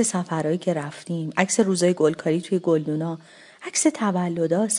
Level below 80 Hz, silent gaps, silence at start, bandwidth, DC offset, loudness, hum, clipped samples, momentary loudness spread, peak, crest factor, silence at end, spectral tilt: -70 dBFS; none; 0 s; 11 kHz; under 0.1%; -23 LUFS; none; under 0.1%; 10 LU; -2 dBFS; 20 dB; 0 s; -5 dB/octave